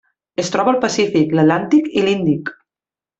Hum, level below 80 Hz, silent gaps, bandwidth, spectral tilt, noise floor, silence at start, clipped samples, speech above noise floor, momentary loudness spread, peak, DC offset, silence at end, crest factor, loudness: none; -56 dBFS; none; 8.2 kHz; -5.5 dB/octave; under -90 dBFS; 0.4 s; under 0.1%; over 75 dB; 9 LU; -2 dBFS; under 0.1%; 0.65 s; 14 dB; -16 LUFS